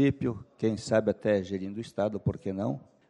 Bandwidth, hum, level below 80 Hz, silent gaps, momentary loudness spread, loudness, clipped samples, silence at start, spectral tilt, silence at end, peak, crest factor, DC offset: 11 kHz; none; -58 dBFS; none; 8 LU; -30 LUFS; under 0.1%; 0 s; -7 dB/octave; 0.3 s; -12 dBFS; 18 dB; under 0.1%